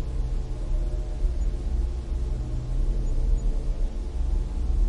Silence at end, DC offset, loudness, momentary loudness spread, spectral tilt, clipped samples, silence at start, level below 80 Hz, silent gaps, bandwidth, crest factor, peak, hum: 0 s; 0.4%; -31 LUFS; 3 LU; -7.5 dB/octave; under 0.1%; 0 s; -26 dBFS; none; 7.4 kHz; 12 dB; -14 dBFS; none